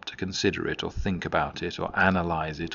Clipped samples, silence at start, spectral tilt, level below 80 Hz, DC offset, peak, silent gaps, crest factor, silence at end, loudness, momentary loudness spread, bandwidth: under 0.1%; 0.05 s; -3.5 dB/octave; -44 dBFS; under 0.1%; -4 dBFS; none; 24 dB; 0 s; -27 LUFS; 8 LU; 7.4 kHz